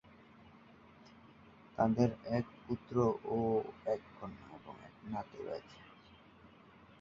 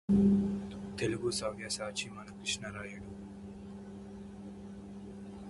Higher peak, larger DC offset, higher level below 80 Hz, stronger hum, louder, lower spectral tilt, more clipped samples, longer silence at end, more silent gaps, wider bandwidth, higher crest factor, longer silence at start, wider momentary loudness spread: about the same, -18 dBFS vs -18 dBFS; neither; second, -66 dBFS vs -56 dBFS; neither; second, -37 LUFS vs -34 LUFS; first, -7.5 dB/octave vs -5 dB/octave; neither; first, 0.55 s vs 0 s; neither; second, 7.2 kHz vs 11.5 kHz; about the same, 22 dB vs 18 dB; first, 1.05 s vs 0.1 s; first, 23 LU vs 18 LU